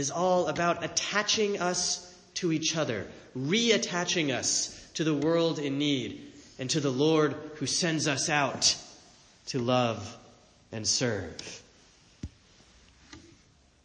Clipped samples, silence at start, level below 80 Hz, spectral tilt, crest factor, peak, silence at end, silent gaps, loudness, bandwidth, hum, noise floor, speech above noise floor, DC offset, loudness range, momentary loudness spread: under 0.1%; 0 s; -62 dBFS; -3 dB/octave; 20 dB; -10 dBFS; 0.65 s; none; -28 LUFS; 10.5 kHz; none; -61 dBFS; 33 dB; under 0.1%; 5 LU; 17 LU